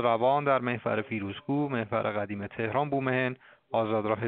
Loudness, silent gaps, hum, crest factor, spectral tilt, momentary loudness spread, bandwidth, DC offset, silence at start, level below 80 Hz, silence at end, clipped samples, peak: -29 LUFS; none; none; 18 dB; -5 dB/octave; 9 LU; 4.6 kHz; under 0.1%; 0 s; -68 dBFS; 0 s; under 0.1%; -10 dBFS